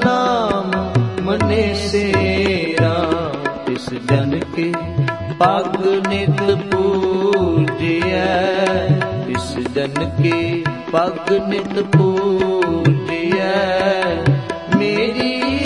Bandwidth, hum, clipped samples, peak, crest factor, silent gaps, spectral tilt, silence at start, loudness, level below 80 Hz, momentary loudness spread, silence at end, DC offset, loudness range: 11 kHz; none; under 0.1%; 0 dBFS; 16 dB; none; -6.5 dB/octave; 0 s; -17 LUFS; -44 dBFS; 5 LU; 0 s; 0.2%; 2 LU